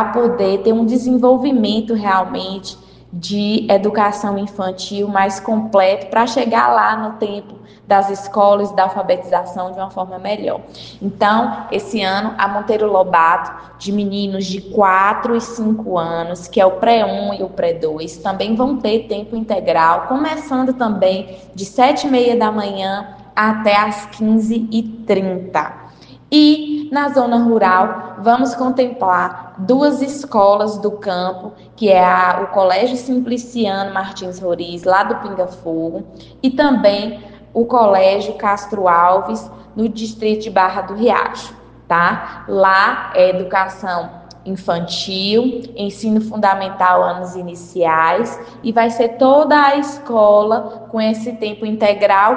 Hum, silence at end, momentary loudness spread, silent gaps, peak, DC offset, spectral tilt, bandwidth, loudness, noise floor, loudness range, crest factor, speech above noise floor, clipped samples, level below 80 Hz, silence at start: none; 0 s; 12 LU; none; 0 dBFS; under 0.1%; -5.5 dB/octave; 9.4 kHz; -16 LUFS; -40 dBFS; 4 LU; 16 dB; 25 dB; under 0.1%; -52 dBFS; 0 s